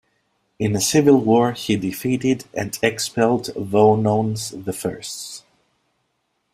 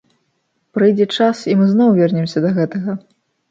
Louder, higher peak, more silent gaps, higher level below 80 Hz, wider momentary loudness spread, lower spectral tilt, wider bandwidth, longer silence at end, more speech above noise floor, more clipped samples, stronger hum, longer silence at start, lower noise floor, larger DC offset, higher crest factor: second, -20 LUFS vs -15 LUFS; about the same, -2 dBFS vs -2 dBFS; neither; first, -56 dBFS vs -64 dBFS; about the same, 13 LU vs 12 LU; second, -5 dB/octave vs -7.5 dB/octave; first, 16 kHz vs 7.6 kHz; first, 1.15 s vs 0.55 s; about the same, 52 dB vs 53 dB; neither; neither; second, 0.6 s vs 0.75 s; first, -71 dBFS vs -67 dBFS; neither; about the same, 18 dB vs 14 dB